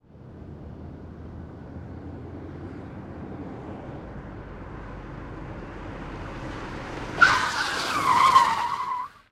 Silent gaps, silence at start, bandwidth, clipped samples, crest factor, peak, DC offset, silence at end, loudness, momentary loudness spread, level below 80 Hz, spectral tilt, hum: none; 0.1 s; 16 kHz; under 0.1%; 24 dB; -4 dBFS; under 0.1%; 0.15 s; -23 LUFS; 22 LU; -46 dBFS; -3.5 dB/octave; none